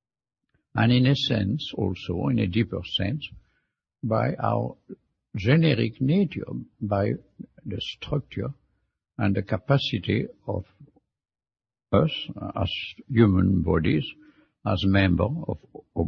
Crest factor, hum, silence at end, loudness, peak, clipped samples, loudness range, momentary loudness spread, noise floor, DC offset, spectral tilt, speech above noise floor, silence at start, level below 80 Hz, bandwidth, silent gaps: 20 dB; none; 0 s; -25 LUFS; -4 dBFS; under 0.1%; 5 LU; 14 LU; -85 dBFS; under 0.1%; -8 dB/octave; 60 dB; 0.75 s; -48 dBFS; 6.8 kHz; none